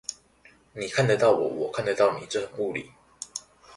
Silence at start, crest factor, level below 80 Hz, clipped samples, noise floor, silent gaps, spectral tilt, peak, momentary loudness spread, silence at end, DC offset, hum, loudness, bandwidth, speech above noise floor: 0.1 s; 20 dB; -64 dBFS; under 0.1%; -58 dBFS; none; -4.5 dB/octave; -8 dBFS; 17 LU; 0 s; under 0.1%; none; -26 LUFS; 11.5 kHz; 33 dB